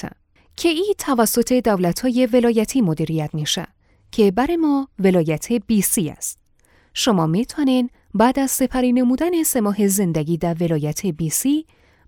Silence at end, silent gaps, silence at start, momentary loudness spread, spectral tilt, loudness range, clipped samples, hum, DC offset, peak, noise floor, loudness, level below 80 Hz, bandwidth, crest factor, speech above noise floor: 0.45 s; none; 0.05 s; 6 LU; -5 dB/octave; 1 LU; under 0.1%; none; under 0.1%; -2 dBFS; -56 dBFS; -19 LUFS; -48 dBFS; 19.5 kHz; 16 dB; 38 dB